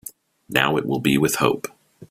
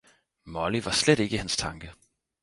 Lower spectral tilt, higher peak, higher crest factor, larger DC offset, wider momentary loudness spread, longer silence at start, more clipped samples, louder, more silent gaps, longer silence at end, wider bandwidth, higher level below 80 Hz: about the same, -4.5 dB/octave vs -3.5 dB/octave; first, 0 dBFS vs -8 dBFS; about the same, 22 dB vs 22 dB; neither; second, 13 LU vs 19 LU; second, 0.05 s vs 0.45 s; neither; first, -21 LUFS vs -26 LUFS; neither; second, 0.05 s vs 0.5 s; first, 16 kHz vs 11.5 kHz; second, -56 dBFS vs -50 dBFS